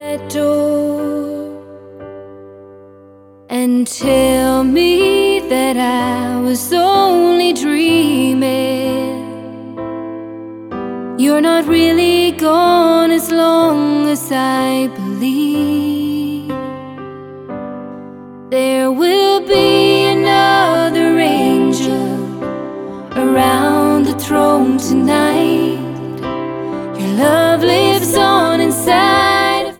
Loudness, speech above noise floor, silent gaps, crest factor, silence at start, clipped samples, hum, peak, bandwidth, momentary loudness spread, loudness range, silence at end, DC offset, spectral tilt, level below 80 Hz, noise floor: -13 LUFS; 29 dB; none; 14 dB; 0 s; under 0.1%; none; 0 dBFS; 19 kHz; 16 LU; 7 LU; 0.05 s; under 0.1%; -4.5 dB/octave; -46 dBFS; -42 dBFS